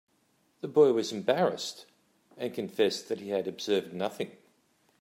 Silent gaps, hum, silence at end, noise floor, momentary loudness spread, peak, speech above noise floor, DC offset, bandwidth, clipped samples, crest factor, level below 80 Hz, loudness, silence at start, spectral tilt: none; none; 0.7 s; -70 dBFS; 15 LU; -10 dBFS; 42 dB; under 0.1%; 16 kHz; under 0.1%; 20 dB; -80 dBFS; -30 LUFS; 0.65 s; -4.5 dB/octave